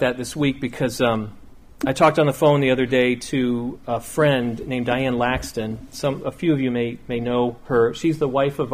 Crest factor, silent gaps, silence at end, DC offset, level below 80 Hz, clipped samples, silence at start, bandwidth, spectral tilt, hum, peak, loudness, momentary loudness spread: 18 dB; none; 0 s; under 0.1%; -46 dBFS; under 0.1%; 0 s; 15.5 kHz; -6 dB/octave; none; -4 dBFS; -21 LUFS; 9 LU